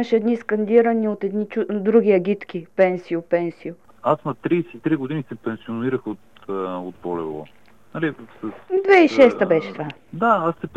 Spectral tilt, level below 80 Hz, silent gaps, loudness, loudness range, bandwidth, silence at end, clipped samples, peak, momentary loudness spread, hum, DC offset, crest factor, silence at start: -7.5 dB/octave; -64 dBFS; none; -20 LUFS; 8 LU; 7.8 kHz; 0.1 s; under 0.1%; -2 dBFS; 17 LU; none; 0.3%; 18 dB; 0 s